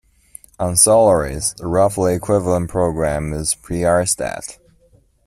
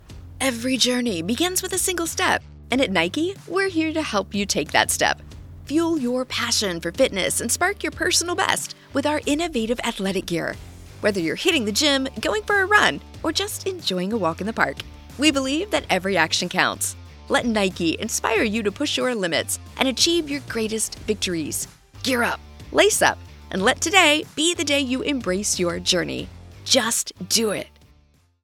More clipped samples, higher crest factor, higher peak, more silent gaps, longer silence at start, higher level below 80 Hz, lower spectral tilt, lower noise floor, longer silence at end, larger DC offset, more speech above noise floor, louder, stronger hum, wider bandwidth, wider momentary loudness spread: neither; about the same, 18 dB vs 22 dB; about the same, 0 dBFS vs 0 dBFS; neither; first, 0.6 s vs 0.1 s; first, -38 dBFS vs -46 dBFS; first, -4.5 dB/octave vs -2.5 dB/octave; second, -54 dBFS vs -58 dBFS; about the same, 0.75 s vs 0.75 s; neither; about the same, 38 dB vs 36 dB; first, -17 LUFS vs -21 LUFS; neither; second, 14.5 kHz vs 18 kHz; about the same, 10 LU vs 8 LU